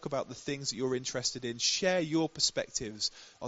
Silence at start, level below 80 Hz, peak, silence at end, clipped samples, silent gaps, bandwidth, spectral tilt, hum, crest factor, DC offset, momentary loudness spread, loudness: 0 s; -64 dBFS; -14 dBFS; 0 s; under 0.1%; none; 8 kHz; -2.5 dB/octave; none; 18 dB; under 0.1%; 8 LU; -32 LUFS